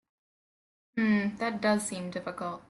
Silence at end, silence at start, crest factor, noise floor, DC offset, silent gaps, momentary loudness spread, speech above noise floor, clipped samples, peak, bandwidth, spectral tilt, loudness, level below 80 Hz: 0.1 s; 0.95 s; 18 dB; under -90 dBFS; under 0.1%; none; 10 LU; over 58 dB; under 0.1%; -14 dBFS; 12 kHz; -5 dB/octave; -30 LUFS; -70 dBFS